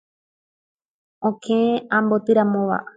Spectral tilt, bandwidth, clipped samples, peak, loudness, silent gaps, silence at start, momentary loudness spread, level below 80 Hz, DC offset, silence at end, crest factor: -7.5 dB/octave; 7.8 kHz; under 0.1%; -6 dBFS; -20 LUFS; none; 1.2 s; 8 LU; -68 dBFS; under 0.1%; 0.15 s; 16 dB